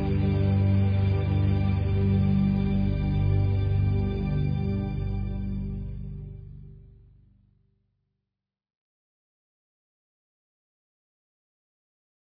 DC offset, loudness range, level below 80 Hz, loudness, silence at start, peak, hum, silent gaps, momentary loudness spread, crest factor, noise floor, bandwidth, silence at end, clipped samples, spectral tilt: under 0.1%; 16 LU; -36 dBFS; -26 LUFS; 0 s; -14 dBFS; 50 Hz at -45 dBFS; none; 13 LU; 14 dB; -87 dBFS; 5 kHz; 5.45 s; under 0.1%; -11 dB/octave